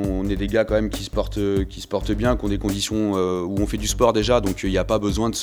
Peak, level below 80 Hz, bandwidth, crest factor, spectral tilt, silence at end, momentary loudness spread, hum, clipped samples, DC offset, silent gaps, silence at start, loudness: -2 dBFS; -32 dBFS; over 20 kHz; 20 dB; -5 dB/octave; 0 s; 6 LU; none; under 0.1%; under 0.1%; none; 0 s; -22 LUFS